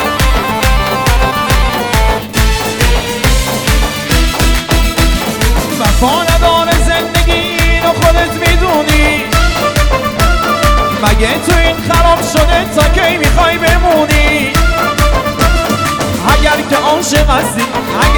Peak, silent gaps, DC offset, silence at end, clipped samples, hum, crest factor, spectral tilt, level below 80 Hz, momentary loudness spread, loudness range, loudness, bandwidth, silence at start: 0 dBFS; none; under 0.1%; 0 s; under 0.1%; none; 10 dB; -4 dB/octave; -14 dBFS; 3 LU; 2 LU; -11 LUFS; over 20 kHz; 0 s